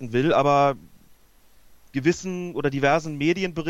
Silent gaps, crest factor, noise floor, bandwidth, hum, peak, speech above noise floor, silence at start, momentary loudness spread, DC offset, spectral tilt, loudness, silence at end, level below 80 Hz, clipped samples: none; 18 dB; -54 dBFS; 12 kHz; none; -6 dBFS; 32 dB; 0 s; 10 LU; under 0.1%; -6 dB/octave; -23 LUFS; 0 s; -54 dBFS; under 0.1%